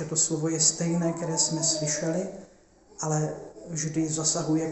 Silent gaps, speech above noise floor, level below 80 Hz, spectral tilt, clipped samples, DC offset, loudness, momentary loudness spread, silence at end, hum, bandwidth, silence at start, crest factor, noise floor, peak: none; 29 dB; -60 dBFS; -3.5 dB/octave; under 0.1%; under 0.1%; -26 LUFS; 12 LU; 0 s; none; 8.6 kHz; 0 s; 20 dB; -56 dBFS; -8 dBFS